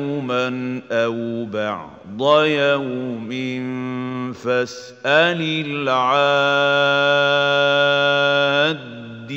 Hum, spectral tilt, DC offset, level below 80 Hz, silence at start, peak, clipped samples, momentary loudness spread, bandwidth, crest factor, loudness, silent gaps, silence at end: none; -5 dB/octave; under 0.1%; -66 dBFS; 0 s; -2 dBFS; under 0.1%; 11 LU; 7.8 kHz; 18 dB; -18 LUFS; none; 0 s